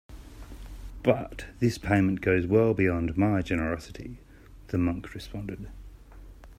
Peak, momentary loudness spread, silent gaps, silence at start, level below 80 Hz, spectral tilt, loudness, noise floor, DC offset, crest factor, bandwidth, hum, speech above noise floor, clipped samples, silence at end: -6 dBFS; 22 LU; none; 0.1 s; -46 dBFS; -7.5 dB/octave; -27 LUFS; -47 dBFS; under 0.1%; 22 dB; 15 kHz; none; 21 dB; under 0.1%; 0.05 s